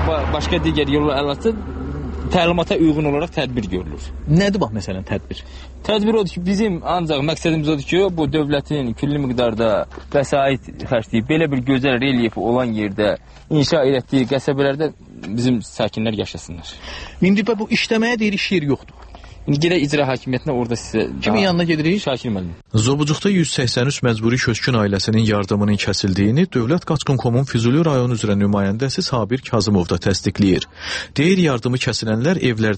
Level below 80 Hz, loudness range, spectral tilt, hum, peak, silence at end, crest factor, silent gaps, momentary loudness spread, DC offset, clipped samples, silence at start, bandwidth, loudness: -36 dBFS; 3 LU; -6 dB/octave; none; -4 dBFS; 0 s; 14 dB; none; 9 LU; under 0.1%; under 0.1%; 0 s; 8.8 kHz; -19 LUFS